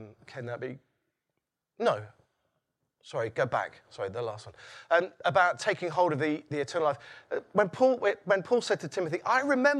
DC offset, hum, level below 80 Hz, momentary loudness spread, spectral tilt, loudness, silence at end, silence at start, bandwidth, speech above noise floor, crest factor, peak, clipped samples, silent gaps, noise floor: under 0.1%; none; -76 dBFS; 14 LU; -5 dB/octave; -29 LUFS; 0 s; 0 s; 11 kHz; 56 dB; 20 dB; -10 dBFS; under 0.1%; none; -85 dBFS